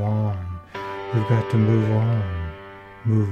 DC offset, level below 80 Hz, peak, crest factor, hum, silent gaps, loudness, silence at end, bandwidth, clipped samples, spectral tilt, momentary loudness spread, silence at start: under 0.1%; -44 dBFS; -6 dBFS; 16 dB; none; none; -23 LUFS; 0 s; 6 kHz; under 0.1%; -9 dB/octave; 14 LU; 0 s